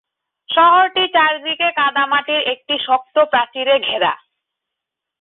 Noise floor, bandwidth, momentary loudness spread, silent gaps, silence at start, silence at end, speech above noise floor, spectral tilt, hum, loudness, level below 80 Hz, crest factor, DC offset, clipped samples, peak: -82 dBFS; 4.2 kHz; 7 LU; none; 0.5 s; 1.05 s; 66 dB; -7 dB/octave; none; -15 LUFS; -62 dBFS; 14 dB; under 0.1%; under 0.1%; -2 dBFS